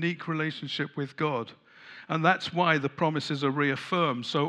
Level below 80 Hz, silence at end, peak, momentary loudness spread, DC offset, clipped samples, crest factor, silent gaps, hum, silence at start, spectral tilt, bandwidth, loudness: -78 dBFS; 0 s; -6 dBFS; 9 LU; under 0.1%; under 0.1%; 22 dB; none; none; 0 s; -6 dB/octave; 10.5 kHz; -28 LUFS